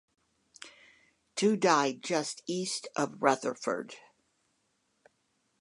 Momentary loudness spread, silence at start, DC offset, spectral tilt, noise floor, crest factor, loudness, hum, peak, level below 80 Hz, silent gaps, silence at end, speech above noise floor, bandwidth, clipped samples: 24 LU; 0.65 s; under 0.1%; -3.5 dB/octave; -76 dBFS; 26 dB; -30 LUFS; none; -8 dBFS; -86 dBFS; none; 1.65 s; 46 dB; 11.5 kHz; under 0.1%